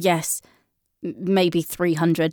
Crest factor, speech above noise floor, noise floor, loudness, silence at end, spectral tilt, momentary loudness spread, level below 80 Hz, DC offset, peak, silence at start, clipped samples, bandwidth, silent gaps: 14 dB; 45 dB; -66 dBFS; -22 LUFS; 0 s; -5 dB/octave; 12 LU; -62 dBFS; under 0.1%; -8 dBFS; 0 s; under 0.1%; over 20 kHz; none